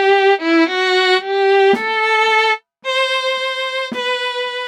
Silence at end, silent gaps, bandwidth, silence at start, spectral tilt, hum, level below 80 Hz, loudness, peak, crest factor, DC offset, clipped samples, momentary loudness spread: 0 s; none; 11 kHz; 0 s; -2.5 dB/octave; none; -74 dBFS; -15 LUFS; -2 dBFS; 12 dB; under 0.1%; under 0.1%; 7 LU